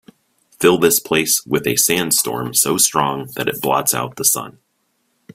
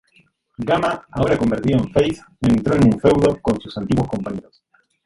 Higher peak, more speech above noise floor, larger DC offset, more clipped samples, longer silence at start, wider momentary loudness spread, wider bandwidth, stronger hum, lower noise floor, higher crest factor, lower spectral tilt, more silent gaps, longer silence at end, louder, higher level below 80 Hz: about the same, 0 dBFS vs -2 dBFS; first, 49 dB vs 40 dB; neither; neither; about the same, 0.6 s vs 0.6 s; about the same, 8 LU vs 10 LU; first, 16.5 kHz vs 11.5 kHz; neither; first, -67 dBFS vs -58 dBFS; about the same, 18 dB vs 18 dB; second, -2.5 dB/octave vs -7.5 dB/octave; neither; first, 0.85 s vs 0.65 s; first, -16 LUFS vs -19 LUFS; second, -56 dBFS vs -40 dBFS